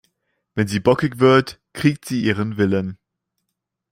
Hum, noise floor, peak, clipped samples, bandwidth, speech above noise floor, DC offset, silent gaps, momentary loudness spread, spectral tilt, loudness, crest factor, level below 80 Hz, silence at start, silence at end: none; -79 dBFS; -2 dBFS; under 0.1%; 16 kHz; 61 dB; under 0.1%; none; 12 LU; -6.5 dB/octave; -19 LUFS; 18 dB; -54 dBFS; 0.55 s; 1 s